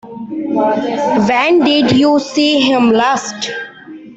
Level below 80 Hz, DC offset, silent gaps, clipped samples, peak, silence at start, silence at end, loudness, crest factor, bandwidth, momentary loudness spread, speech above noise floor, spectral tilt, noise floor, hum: -52 dBFS; under 0.1%; none; under 0.1%; -2 dBFS; 0.05 s; 0 s; -13 LUFS; 12 dB; 8.2 kHz; 12 LU; 22 dB; -4.5 dB/octave; -34 dBFS; none